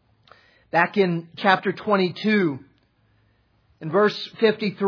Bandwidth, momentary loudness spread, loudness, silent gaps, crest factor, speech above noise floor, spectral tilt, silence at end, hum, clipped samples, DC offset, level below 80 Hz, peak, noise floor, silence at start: 5.4 kHz; 5 LU; -22 LUFS; none; 20 dB; 42 dB; -7 dB/octave; 0 s; none; under 0.1%; under 0.1%; -72 dBFS; -2 dBFS; -63 dBFS; 0.75 s